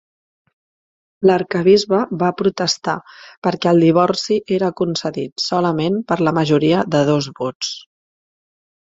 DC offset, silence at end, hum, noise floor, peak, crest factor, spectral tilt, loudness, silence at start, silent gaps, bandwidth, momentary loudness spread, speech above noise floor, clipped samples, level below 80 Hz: under 0.1%; 1 s; none; under -90 dBFS; -2 dBFS; 16 dB; -5.5 dB/octave; -17 LUFS; 1.2 s; 3.37-3.42 s, 5.32-5.36 s, 7.55-7.60 s; 7.8 kHz; 10 LU; over 73 dB; under 0.1%; -58 dBFS